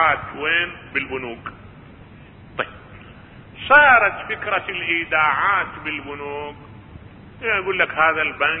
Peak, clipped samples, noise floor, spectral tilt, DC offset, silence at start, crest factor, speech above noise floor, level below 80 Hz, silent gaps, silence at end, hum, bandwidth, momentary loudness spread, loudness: 0 dBFS; under 0.1%; -43 dBFS; -8.5 dB/octave; under 0.1%; 0 s; 20 dB; 23 dB; -50 dBFS; none; 0 s; none; 4.9 kHz; 18 LU; -19 LUFS